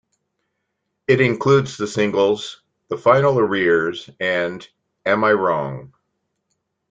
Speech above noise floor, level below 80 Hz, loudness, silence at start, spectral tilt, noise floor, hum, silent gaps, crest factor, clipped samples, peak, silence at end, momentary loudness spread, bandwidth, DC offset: 57 dB; -60 dBFS; -18 LUFS; 1.1 s; -6 dB/octave; -75 dBFS; none; none; 18 dB; under 0.1%; -2 dBFS; 1.05 s; 15 LU; 8.8 kHz; under 0.1%